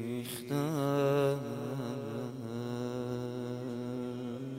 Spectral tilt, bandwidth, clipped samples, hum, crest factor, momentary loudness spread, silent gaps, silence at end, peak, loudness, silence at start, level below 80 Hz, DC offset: -6.5 dB/octave; 16.5 kHz; under 0.1%; none; 18 dB; 10 LU; none; 0 s; -18 dBFS; -35 LUFS; 0 s; -72 dBFS; under 0.1%